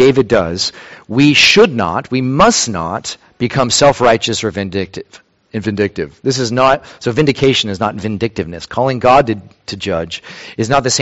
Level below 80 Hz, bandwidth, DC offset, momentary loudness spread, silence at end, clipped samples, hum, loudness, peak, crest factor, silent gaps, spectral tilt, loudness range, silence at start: -42 dBFS; 8.2 kHz; under 0.1%; 13 LU; 0 s; under 0.1%; none; -13 LUFS; 0 dBFS; 14 dB; none; -4 dB/octave; 5 LU; 0 s